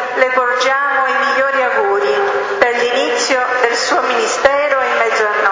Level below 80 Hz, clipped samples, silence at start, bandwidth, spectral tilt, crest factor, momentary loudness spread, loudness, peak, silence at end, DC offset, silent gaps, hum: -54 dBFS; under 0.1%; 0 s; 7.8 kHz; -1 dB/octave; 14 dB; 2 LU; -14 LUFS; 0 dBFS; 0 s; under 0.1%; none; none